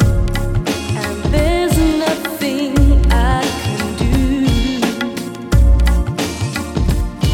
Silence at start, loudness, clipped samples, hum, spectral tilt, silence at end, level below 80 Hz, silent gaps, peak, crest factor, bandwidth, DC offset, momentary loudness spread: 0 s; -16 LUFS; under 0.1%; none; -6 dB/octave; 0 s; -18 dBFS; none; -2 dBFS; 14 dB; 16.5 kHz; under 0.1%; 7 LU